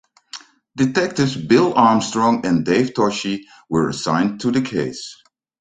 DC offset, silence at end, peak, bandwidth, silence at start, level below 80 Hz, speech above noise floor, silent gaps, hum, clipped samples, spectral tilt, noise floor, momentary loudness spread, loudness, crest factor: under 0.1%; 0.45 s; -2 dBFS; 9.4 kHz; 0.35 s; -56 dBFS; 22 dB; none; none; under 0.1%; -5.5 dB/octave; -40 dBFS; 20 LU; -18 LUFS; 18 dB